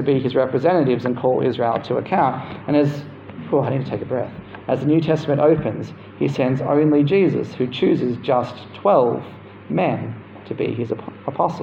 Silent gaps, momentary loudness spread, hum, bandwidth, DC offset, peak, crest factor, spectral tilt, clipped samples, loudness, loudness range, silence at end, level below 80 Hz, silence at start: none; 14 LU; none; 7.6 kHz; under 0.1%; -4 dBFS; 16 dB; -8.5 dB/octave; under 0.1%; -20 LUFS; 3 LU; 0 s; -56 dBFS; 0 s